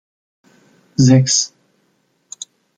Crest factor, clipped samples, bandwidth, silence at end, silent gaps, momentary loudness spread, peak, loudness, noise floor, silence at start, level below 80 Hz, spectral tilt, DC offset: 18 dB; under 0.1%; 9.4 kHz; 1.3 s; none; 22 LU; -2 dBFS; -14 LUFS; -63 dBFS; 1 s; -54 dBFS; -4.5 dB/octave; under 0.1%